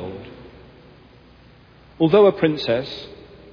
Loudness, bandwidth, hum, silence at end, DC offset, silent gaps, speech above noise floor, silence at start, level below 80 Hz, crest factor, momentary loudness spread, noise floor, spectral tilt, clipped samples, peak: -18 LUFS; 5.4 kHz; none; 0.4 s; under 0.1%; none; 31 dB; 0 s; -54 dBFS; 20 dB; 24 LU; -49 dBFS; -8 dB/octave; under 0.1%; -4 dBFS